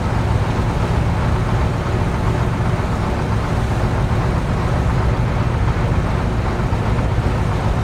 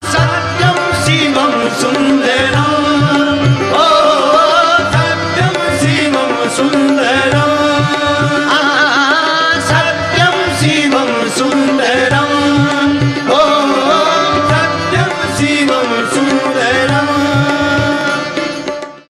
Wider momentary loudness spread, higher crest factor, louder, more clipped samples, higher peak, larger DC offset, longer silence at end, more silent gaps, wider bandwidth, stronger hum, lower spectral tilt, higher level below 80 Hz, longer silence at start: second, 1 LU vs 4 LU; about the same, 12 dB vs 12 dB; second, -19 LUFS vs -11 LUFS; neither; second, -4 dBFS vs 0 dBFS; neither; about the same, 0 s vs 0.1 s; neither; second, 12 kHz vs 14 kHz; neither; first, -7.5 dB/octave vs -4.5 dB/octave; first, -24 dBFS vs -40 dBFS; about the same, 0 s vs 0 s